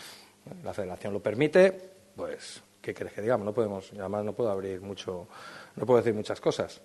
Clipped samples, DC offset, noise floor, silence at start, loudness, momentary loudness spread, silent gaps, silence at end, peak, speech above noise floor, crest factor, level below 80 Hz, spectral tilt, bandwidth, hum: under 0.1%; under 0.1%; -49 dBFS; 0 s; -29 LUFS; 20 LU; none; 0.05 s; -8 dBFS; 20 dB; 22 dB; -70 dBFS; -6 dB/octave; 12.5 kHz; none